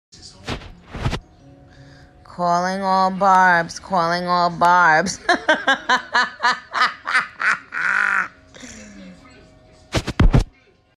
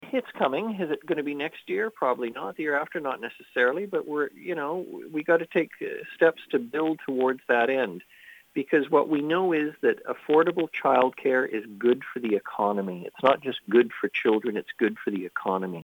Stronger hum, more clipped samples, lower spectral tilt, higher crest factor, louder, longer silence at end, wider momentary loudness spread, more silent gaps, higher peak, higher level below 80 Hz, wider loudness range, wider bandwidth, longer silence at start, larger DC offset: neither; neither; second, -4.5 dB/octave vs -7 dB/octave; about the same, 16 dB vs 20 dB; first, -18 LUFS vs -26 LUFS; first, 0.5 s vs 0 s; first, 17 LU vs 9 LU; neither; about the same, -4 dBFS vs -6 dBFS; first, -30 dBFS vs -78 dBFS; about the same, 6 LU vs 4 LU; second, 12.5 kHz vs over 20 kHz; first, 0.25 s vs 0 s; neither